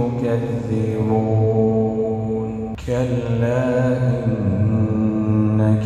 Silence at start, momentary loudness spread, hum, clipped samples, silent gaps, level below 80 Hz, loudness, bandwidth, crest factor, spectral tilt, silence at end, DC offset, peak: 0 s; 6 LU; none; under 0.1%; none; -42 dBFS; -20 LUFS; 8 kHz; 12 dB; -9.5 dB/octave; 0 s; under 0.1%; -6 dBFS